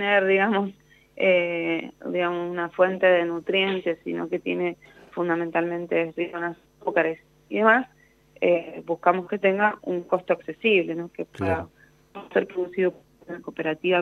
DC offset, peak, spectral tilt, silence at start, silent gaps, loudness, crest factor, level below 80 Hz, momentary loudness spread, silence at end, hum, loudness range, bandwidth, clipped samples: under 0.1%; -4 dBFS; -7 dB/octave; 0 s; none; -24 LUFS; 20 dB; -66 dBFS; 13 LU; 0 s; none; 4 LU; 6.6 kHz; under 0.1%